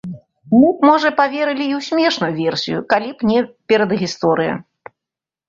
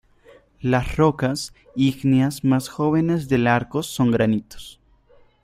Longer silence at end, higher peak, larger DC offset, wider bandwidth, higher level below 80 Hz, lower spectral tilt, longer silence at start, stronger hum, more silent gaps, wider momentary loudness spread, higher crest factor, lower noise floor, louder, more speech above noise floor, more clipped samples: about the same, 0.85 s vs 0.75 s; about the same, -2 dBFS vs -4 dBFS; neither; second, 7.6 kHz vs 15.5 kHz; second, -58 dBFS vs -44 dBFS; about the same, -5.5 dB/octave vs -6.5 dB/octave; second, 0.05 s vs 0.65 s; neither; neither; second, 8 LU vs 11 LU; about the same, 16 dB vs 18 dB; first, -87 dBFS vs -54 dBFS; first, -16 LUFS vs -21 LUFS; first, 71 dB vs 34 dB; neither